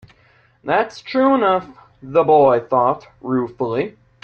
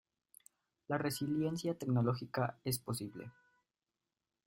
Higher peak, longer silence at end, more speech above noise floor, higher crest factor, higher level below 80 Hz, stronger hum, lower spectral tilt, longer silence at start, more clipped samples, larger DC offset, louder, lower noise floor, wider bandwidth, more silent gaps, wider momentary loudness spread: first, -2 dBFS vs -20 dBFS; second, 0.35 s vs 1.15 s; second, 38 dB vs over 53 dB; about the same, 16 dB vs 20 dB; first, -58 dBFS vs -72 dBFS; neither; first, -7.5 dB/octave vs -6 dB/octave; second, 0.65 s vs 0.9 s; neither; neither; first, -18 LUFS vs -38 LUFS; second, -55 dBFS vs under -90 dBFS; second, 7 kHz vs 16 kHz; neither; about the same, 11 LU vs 10 LU